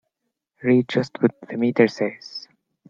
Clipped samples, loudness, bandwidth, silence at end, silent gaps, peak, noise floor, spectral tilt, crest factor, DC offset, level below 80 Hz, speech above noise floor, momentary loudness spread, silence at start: under 0.1%; -21 LUFS; 7.4 kHz; 0.5 s; none; -2 dBFS; -79 dBFS; -7 dB/octave; 20 dB; under 0.1%; -68 dBFS; 59 dB; 16 LU; 0.6 s